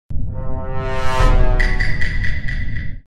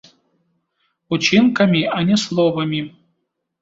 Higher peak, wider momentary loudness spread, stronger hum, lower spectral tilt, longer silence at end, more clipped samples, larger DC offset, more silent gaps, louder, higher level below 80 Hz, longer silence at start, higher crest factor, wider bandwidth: about the same, -2 dBFS vs -2 dBFS; about the same, 10 LU vs 11 LU; neither; about the same, -6 dB/octave vs -5.5 dB/octave; second, 0.1 s vs 0.75 s; neither; neither; neither; second, -21 LUFS vs -17 LUFS; first, -18 dBFS vs -58 dBFS; second, 0.1 s vs 1.1 s; about the same, 14 dB vs 16 dB; first, 9.4 kHz vs 8 kHz